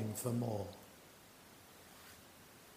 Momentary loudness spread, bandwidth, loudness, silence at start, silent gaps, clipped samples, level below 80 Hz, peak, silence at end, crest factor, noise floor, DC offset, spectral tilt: 20 LU; 15.5 kHz; -41 LUFS; 0 s; none; under 0.1%; -76 dBFS; -26 dBFS; 0 s; 20 dB; -60 dBFS; under 0.1%; -6 dB/octave